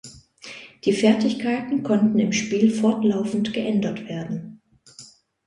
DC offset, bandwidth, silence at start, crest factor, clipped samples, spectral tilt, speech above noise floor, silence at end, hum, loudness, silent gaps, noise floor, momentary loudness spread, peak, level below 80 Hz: under 0.1%; 10.5 kHz; 0.05 s; 18 dB; under 0.1%; -5.5 dB/octave; 27 dB; 0.4 s; none; -22 LUFS; none; -48 dBFS; 18 LU; -6 dBFS; -62 dBFS